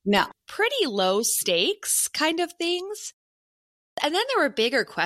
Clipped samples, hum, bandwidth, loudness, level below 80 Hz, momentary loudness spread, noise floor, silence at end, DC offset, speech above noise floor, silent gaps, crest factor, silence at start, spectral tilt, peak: under 0.1%; none; 16 kHz; -23 LUFS; -64 dBFS; 8 LU; under -90 dBFS; 0 s; under 0.1%; over 66 dB; 3.13-3.97 s; 20 dB; 0.05 s; -2 dB/octave; -6 dBFS